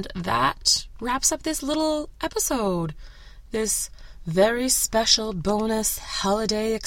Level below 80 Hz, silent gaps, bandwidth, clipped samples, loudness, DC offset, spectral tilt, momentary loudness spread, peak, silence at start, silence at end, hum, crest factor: -42 dBFS; none; 16.5 kHz; under 0.1%; -23 LUFS; under 0.1%; -2.5 dB/octave; 9 LU; -4 dBFS; 0 s; 0 s; none; 20 dB